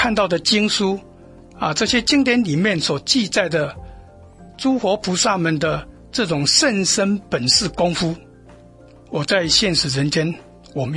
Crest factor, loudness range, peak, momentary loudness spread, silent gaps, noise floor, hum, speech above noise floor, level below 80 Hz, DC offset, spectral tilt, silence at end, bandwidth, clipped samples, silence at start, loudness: 18 dB; 3 LU; -2 dBFS; 12 LU; none; -45 dBFS; none; 26 dB; -46 dBFS; under 0.1%; -3.5 dB/octave; 0 s; 11.5 kHz; under 0.1%; 0 s; -18 LUFS